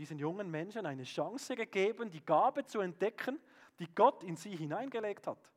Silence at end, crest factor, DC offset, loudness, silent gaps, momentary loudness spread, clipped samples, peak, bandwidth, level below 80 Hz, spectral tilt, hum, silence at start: 0.25 s; 22 dB; under 0.1%; -36 LUFS; none; 13 LU; under 0.1%; -14 dBFS; 15.5 kHz; under -90 dBFS; -5.5 dB/octave; none; 0 s